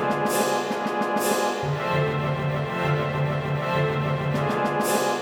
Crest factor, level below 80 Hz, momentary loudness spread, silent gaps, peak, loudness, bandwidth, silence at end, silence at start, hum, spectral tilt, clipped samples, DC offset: 16 dB; -54 dBFS; 3 LU; none; -8 dBFS; -24 LUFS; over 20 kHz; 0 s; 0 s; none; -5 dB/octave; under 0.1%; under 0.1%